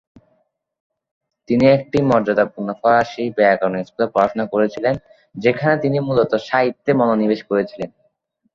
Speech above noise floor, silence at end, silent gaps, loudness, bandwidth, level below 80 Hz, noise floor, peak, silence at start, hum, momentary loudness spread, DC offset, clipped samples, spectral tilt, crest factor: 48 dB; 0.7 s; none; -18 LUFS; 7.4 kHz; -54 dBFS; -65 dBFS; -2 dBFS; 1.5 s; none; 7 LU; under 0.1%; under 0.1%; -7.5 dB/octave; 18 dB